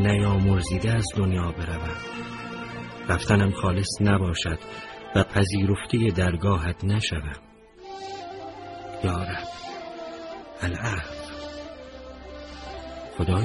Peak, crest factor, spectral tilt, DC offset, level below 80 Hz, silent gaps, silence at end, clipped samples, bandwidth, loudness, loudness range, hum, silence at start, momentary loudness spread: -6 dBFS; 20 dB; -6 dB/octave; under 0.1%; -40 dBFS; none; 0 s; under 0.1%; 11.5 kHz; -26 LUFS; 10 LU; none; 0 s; 17 LU